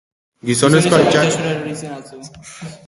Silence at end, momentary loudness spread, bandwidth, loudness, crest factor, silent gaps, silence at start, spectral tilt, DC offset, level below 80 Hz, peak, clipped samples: 0.1 s; 23 LU; 11.5 kHz; -15 LUFS; 18 dB; none; 0.45 s; -4.5 dB/octave; under 0.1%; -52 dBFS; 0 dBFS; under 0.1%